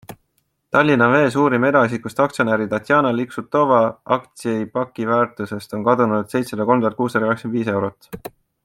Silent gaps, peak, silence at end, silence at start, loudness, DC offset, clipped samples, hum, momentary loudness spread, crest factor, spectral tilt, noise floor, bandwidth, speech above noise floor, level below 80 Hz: none; -2 dBFS; 0.35 s; 0.1 s; -19 LUFS; under 0.1%; under 0.1%; none; 10 LU; 18 dB; -6.5 dB/octave; -68 dBFS; 16.5 kHz; 50 dB; -60 dBFS